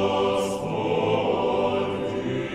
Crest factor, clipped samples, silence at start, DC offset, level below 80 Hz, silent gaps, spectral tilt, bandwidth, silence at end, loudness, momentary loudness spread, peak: 16 dB; under 0.1%; 0 s; under 0.1%; -54 dBFS; none; -6 dB/octave; 14.5 kHz; 0 s; -25 LUFS; 5 LU; -8 dBFS